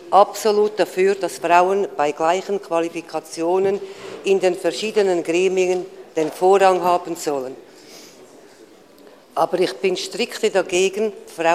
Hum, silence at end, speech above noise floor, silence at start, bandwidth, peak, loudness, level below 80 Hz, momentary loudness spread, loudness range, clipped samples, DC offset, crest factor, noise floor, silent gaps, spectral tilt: none; 0 s; 28 dB; 0 s; 15 kHz; 0 dBFS; -20 LUFS; -68 dBFS; 11 LU; 6 LU; under 0.1%; under 0.1%; 20 dB; -47 dBFS; none; -4 dB/octave